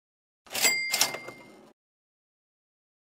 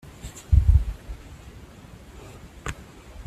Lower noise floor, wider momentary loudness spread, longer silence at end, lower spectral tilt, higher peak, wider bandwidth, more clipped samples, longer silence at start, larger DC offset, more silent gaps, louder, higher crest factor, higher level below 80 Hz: about the same, -47 dBFS vs -45 dBFS; second, 16 LU vs 25 LU; first, 1.65 s vs 0.05 s; second, 1 dB/octave vs -6.5 dB/octave; about the same, -4 dBFS vs -6 dBFS; first, 16 kHz vs 13 kHz; neither; first, 0.5 s vs 0.25 s; neither; neither; about the same, -25 LUFS vs -24 LUFS; first, 30 dB vs 20 dB; second, -74 dBFS vs -28 dBFS